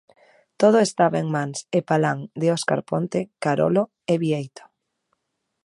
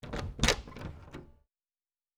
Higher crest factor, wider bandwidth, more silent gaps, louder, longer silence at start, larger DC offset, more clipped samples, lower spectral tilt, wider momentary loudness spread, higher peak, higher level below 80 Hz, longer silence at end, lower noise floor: second, 20 dB vs 34 dB; second, 11.5 kHz vs over 20 kHz; neither; first, -22 LUFS vs -31 LUFS; first, 0.6 s vs 0.05 s; neither; neither; first, -6 dB/octave vs -3 dB/octave; second, 8 LU vs 21 LU; about the same, -4 dBFS vs -4 dBFS; second, -68 dBFS vs -44 dBFS; first, 1.15 s vs 0.85 s; second, -74 dBFS vs under -90 dBFS